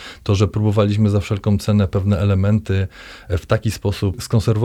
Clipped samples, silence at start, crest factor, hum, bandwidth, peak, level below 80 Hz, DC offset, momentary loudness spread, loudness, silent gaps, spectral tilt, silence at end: under 0.1%; 0 s; 14 dB; none; 13 kHz; -4 dBFS; -38 dBFS; under 0.1%; 6 LU; -19 LUFS; none; -7 dB/octave; 0 s